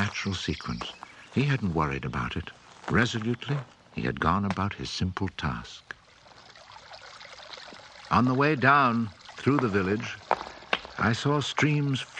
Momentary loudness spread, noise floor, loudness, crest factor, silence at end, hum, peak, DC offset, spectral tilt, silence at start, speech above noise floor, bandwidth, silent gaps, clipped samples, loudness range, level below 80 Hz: 21 LU; -54 dBFS; -27 LUFS; 22 dB; 0 s; none; -6 dBFS; under 0.1%; -6 dB/octave; 0 s; 27 dB; 9.4 kHz; none; under 0.1%; 8 LU; -52 dBFS